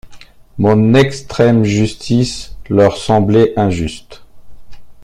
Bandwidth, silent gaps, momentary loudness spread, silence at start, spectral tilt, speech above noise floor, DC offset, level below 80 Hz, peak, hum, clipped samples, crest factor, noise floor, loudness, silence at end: 11.5 kHz; none; 11 LU; 0.05 s; -6.5 dB/octave; 24 dB; under 0.1%; -38 dBFS; 0 dBFS; none; under 0.1%; 14 dB; -36 dBFS; -13 LUFS; 0 s